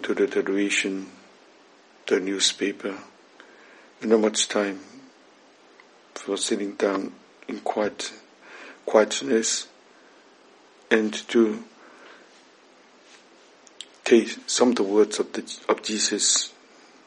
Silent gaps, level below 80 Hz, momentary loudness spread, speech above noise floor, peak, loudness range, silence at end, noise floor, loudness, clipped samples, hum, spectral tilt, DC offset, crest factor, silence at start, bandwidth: none; -80 dBFS; 17 LU; 31 dB; -2 dBFS; 6 LU; 0.55 s; -54 dBFS; -24 LUFS; under 0.1%; none; -2 dB/octave; under 0.1%; 24 dB; 0 s; 11 kHz